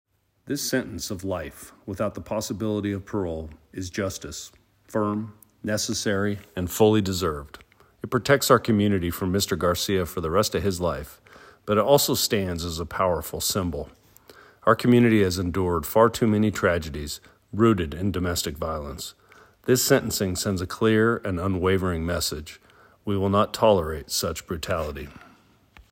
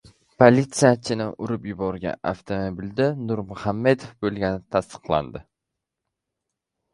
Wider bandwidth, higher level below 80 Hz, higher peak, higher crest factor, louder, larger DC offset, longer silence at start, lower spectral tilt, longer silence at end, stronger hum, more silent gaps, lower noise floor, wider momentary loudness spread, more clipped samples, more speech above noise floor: first, 16.5 kHz vs 11.5 kHz; about the same, -48 dBFS vs -50 dBFS; second, -4 dBFS vs 0 dBFS; about the same, 20 dB vs 24 dB; about the same, -24 LUFS vs -23 LUFS; neither; about the same, 0.45 s vs 0.4 s; about the same, -5 dB/octave vs -6 dB/octave; second, 0.75 s vs 1.55 s; neither; neither; second, -56 dBFS vs -84 dBFS; first, 16 LU vs 12 LU; neither; second, 32 dB vs 61 dB